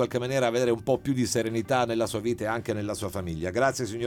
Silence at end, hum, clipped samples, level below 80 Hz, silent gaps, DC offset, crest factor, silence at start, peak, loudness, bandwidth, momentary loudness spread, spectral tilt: 0 s; none; under 0.1%; -54 dBFS; none; under 0.1%; 16 dB; 0 s; -10 dBFS; -27 LUFS; 18 kHz; 6 LU; -5 dB/octave